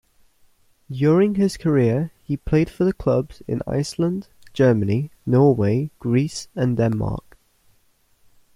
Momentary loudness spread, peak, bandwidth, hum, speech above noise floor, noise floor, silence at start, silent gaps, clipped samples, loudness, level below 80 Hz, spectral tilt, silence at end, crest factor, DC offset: 11 LU; -4 dBFS; 12.5 kHz; none; 42 dB; -62 dBFS; 0.9 s; none; under 0.1%; -21 LUFS; -44 dBFS; -7.5 dB/octave; 1.35 s; 18 dB; under 0.1%